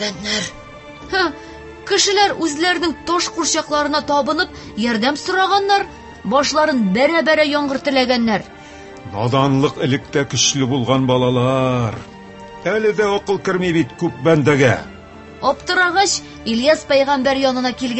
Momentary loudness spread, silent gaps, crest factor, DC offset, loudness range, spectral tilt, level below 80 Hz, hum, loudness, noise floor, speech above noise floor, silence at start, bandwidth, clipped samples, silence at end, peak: 14 LU; none; 18 dB; under 0.1%; 2 LU; -4 dB/octave; -46 dBFS; none; -17 LUFS; -37 dBFS; 21 dB; 0 s; 8.6 kHz; under 0.1%; 0 s; 0 dBFS